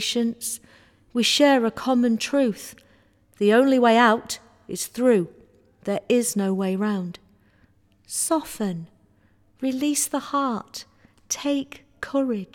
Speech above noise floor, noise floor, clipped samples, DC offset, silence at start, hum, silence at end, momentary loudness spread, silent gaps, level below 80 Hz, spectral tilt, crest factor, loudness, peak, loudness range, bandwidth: 38 dB; -60 dBFS; under 0.1%; under 0.1%; 0 s; none; 0.1 s; 18 LU; none; -64 dBFS; -3.5 dB/octave; 18 dB; -22 LUFS; -6 dBFS; 7 LU; 18 kHz